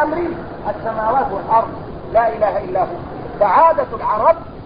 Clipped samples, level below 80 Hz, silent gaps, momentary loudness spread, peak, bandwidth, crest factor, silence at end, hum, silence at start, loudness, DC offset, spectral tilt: under 0.1%; -42 dBFS; none; 13 LU; 0 dBFS; 5.2 kHz; 16 dB; 0 s; none; 0 s; -17 LUFS; 0.7%; -11.5 dB/octave